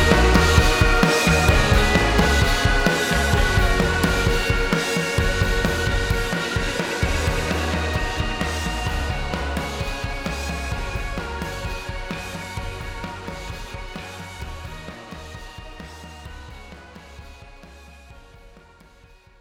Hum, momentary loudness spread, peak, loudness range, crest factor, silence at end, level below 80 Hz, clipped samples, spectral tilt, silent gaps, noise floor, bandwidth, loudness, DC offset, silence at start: none; 22 LU; -2 dBFS; 21 LU; 20 dB; 0.8 s; -26 dBFS; under 0.1%; -4.5 dB/octave; none; -50 dBFS; 17.5 kHz; -21 LUFS; under 0.1%; 0 s